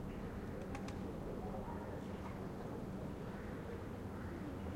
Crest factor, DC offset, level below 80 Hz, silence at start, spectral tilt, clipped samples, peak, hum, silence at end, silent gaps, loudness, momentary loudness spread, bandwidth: 14 dB; under 0.1%; -56 dBFS; 0 s; -7.5 dB/octave; under 0.1%; -30 dBFS; none; 0 s; none; -46 LUFS; 2 LU; 16.5 kHz